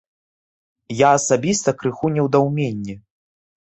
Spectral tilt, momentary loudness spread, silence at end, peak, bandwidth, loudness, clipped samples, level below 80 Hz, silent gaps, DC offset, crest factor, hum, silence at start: -5 dB/octave; 16 LU; 0.8 s; -2 dBFS; 8.4 kHz; -18 LUFS; under 0.1%; -56 dBFS; none; under 0.1%; 18 dB; none; 0.9 s